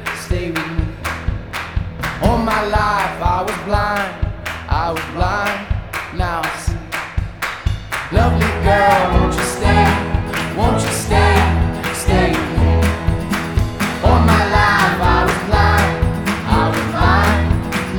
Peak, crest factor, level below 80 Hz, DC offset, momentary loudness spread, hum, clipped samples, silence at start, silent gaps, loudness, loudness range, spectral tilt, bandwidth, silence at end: 0 dBFS; 16 dB; -22 dBFS; under 0.1%; 10 LU; none; under 0.1%; 0 s; none; -17 LUFS; 6 LU; -5.5 dB/octave; 20 kHz; 0 s